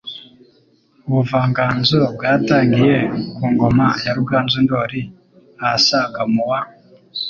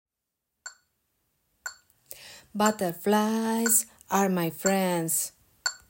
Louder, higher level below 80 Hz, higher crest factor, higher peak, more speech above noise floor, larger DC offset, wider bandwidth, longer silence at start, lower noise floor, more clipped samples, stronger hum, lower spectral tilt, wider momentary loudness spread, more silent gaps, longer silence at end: first, -16 LUFS vs -26 LUFS; first, -46 dBFS vs -72 dBFS; second, 16 dB vs 22 dB; first, -2 dBFS vs -8 dBFS; second, 39 dB vs 59 dB; neither; second, 7.2 kHz vs 16.5 kHz; second, 0.05 s vs 0.65 s; second, -55 dBFS vs -85 dBFS; neither; neither; first, -6 dB/octave vs -3.5 dB/octave; second, 14 LU vs 22 LU; neither; second, 0 s vs 0.15 s